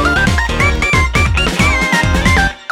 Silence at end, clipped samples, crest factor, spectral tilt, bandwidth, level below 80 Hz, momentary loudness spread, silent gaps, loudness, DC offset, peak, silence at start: 0.05 s; under 0.1%; 12 dB; -4.5 dB/octave; 16 kHz; -18 dBFS; 2 LU; none; -12 LUFS; under 0.1%; 0 dBFS; 0 s